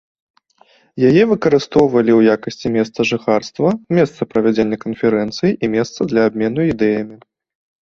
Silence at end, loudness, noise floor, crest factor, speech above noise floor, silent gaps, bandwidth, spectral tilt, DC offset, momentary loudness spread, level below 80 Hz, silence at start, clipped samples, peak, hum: 0.65 s; -16 LUFS; -53 dBFS; 16 dB; 38 dB; none; 7.4 kHz; -7 dB/octave; under 0.1%; 6 LU; -50 dBFS; 0.95 s; under 0.1%; 0 dBFS; none